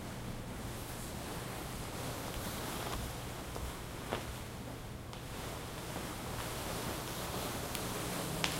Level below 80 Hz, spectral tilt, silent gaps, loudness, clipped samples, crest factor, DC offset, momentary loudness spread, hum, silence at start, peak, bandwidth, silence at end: -50 dBFS; -4 dB/octave; none; -41 LUFS; under 0.1%; 32 dB; under 0.1%; 6 LU; none; 0 s; -8 dBFS; 16 kHz; 0 s